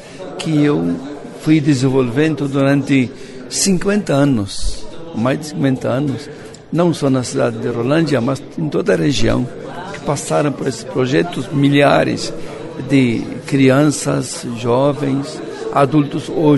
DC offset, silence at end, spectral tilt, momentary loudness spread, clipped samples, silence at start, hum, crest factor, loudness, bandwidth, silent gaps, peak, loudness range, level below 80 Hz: under 0.1%; 0 s; -5.5 dB/octave; 12 LU; under 0.1%; 0 s; none; 16 dB; -16 LUFS; 12 kHz; none; 0 dBFS; 3 LU; -38 dBFS